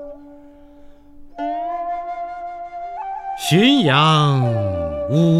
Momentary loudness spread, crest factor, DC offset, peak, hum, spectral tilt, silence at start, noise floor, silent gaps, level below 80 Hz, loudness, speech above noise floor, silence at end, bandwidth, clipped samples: 17 LU; 18 dB; under 0.1%; -2 dBFS; none; -6 dB/octave; 0 s; -43 dBFS; none; -46 dBFS; -18 LUFS; 28 dB; 0 s; 14.5 kHz; under 0.1%